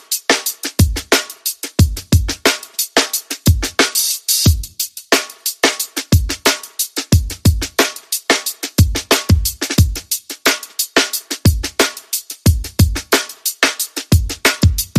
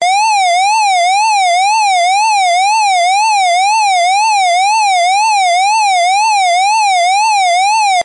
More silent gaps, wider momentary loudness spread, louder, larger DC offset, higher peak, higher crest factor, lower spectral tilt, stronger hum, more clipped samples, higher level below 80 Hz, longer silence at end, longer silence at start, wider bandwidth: neither; first, 6 LU vs 0 LU; second, -16 LUFS vs -10 LUFS; neither; first, 0 dBFS vs -6 dBFS; first, 16 dB vs 4 dB; first, -3.5 dB/octave vs 4 dB/octave; neither; neither; first, -26 dBFS vs -82 dBFS; about the same, 0 s vs 0 s; about the same, 0.1 s vs 0 s; first, 15.5 kHz vs 11.5 kHz